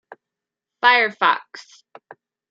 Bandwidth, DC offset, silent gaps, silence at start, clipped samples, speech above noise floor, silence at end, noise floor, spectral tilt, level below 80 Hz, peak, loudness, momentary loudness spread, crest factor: 7.6 kHz; under 0.1%; none; 0.85 s; under 0.1%; 67 dB; 0.9 s; -86 dBFS; -2.5 dB/octave; -82 dBFS; -2 dBFS; -17 LUFS; 12 LU; 22 dB